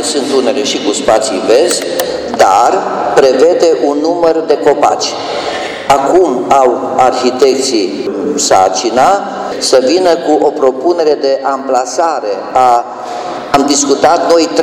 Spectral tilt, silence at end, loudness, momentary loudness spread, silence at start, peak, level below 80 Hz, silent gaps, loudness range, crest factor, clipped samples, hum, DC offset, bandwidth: -3 dB/octave; 0 s; -10 LUFS; 7 LU; 0 s; 0 dBFS; -48 dBFS; none; 2 LU; 10 dB; 0.5%; none; under 0.1%; over 20 kHz